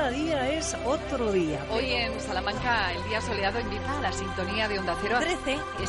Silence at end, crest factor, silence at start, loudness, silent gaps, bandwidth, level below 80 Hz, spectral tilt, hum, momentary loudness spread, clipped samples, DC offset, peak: 0 s; 16 dB; 0 s; -28 LUFS; none; 11.5 kHz; -42 dBFS; -4 dB/octave; none; 4 LU; under 0.1%; under 0.1%; -12 dBFS